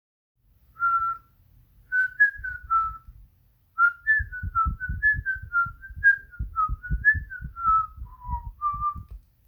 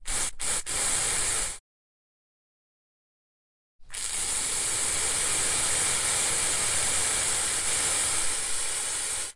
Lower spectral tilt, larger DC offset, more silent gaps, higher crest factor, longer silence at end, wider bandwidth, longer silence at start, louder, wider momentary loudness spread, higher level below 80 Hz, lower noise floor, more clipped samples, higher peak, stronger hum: first, -7 dB/octave vs 0.5 dB/octave; neither; second, none vs 1.60-3.79 s; about the same, 18 dB vs 18 dB; first, 0.3 s vs 0 s; first, 20 kHz vs 11.5 kHz; first, 0.8 s vs 0 s; about the same, -24 LUFS vs -25 LUFS; first, 15 LU vs 5 LU; first, -40 dBFS vs -48 dBFS; second, -62 dBFS vs under -90 dBFS; neither; about the same, -10 dBFS vs -12 dBFS; neither